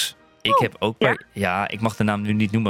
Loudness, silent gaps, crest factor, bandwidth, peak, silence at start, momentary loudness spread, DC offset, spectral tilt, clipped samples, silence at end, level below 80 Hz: -22 LUFS; none; 18 dB; 16.5 kHz; -4 dBFS; 0 s; 5 LU; under 0.1%; -5 dB/octave; under 0.1%; 0 s; -56 dBFS